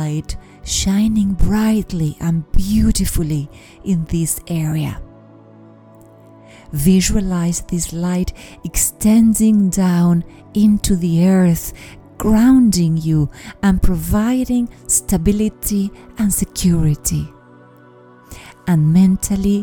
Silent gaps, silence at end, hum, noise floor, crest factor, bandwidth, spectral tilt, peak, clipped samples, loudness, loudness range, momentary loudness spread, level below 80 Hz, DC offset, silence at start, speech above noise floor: none; 0 s; none; -44 dBFS; 14 dB; 19 kHz; -5.5 dB/octave; -2 dBFS; under 0.1%; -16 LUFS; 6 LU; 11 LU; -28 dBFS; under 0.1%; 0 s; 29 dB